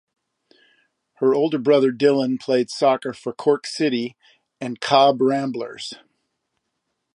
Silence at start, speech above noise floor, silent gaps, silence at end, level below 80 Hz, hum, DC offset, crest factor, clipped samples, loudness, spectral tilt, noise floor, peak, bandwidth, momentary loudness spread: 1.2 s; 57 dB; none; 1.2 s; -74 dBFS; none; under 0.1%; 20 dB; under 0.1%; -20 LUFS; -5 dB/octave; -76 dBFS; -2 dBFS; 11 kHz; 15 LU